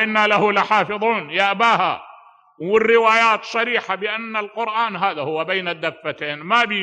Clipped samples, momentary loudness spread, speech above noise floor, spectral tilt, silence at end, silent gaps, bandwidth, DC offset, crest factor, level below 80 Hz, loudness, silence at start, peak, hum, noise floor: under 0.1%; 11 LU; 28 dB; -4 dB/octave; 0 s; none; 9.2 kHz; under 0.1%; 16 dB; -68 dBFS; -18 LUFS; 0 s; -2 dBFS; none; -47 dBFS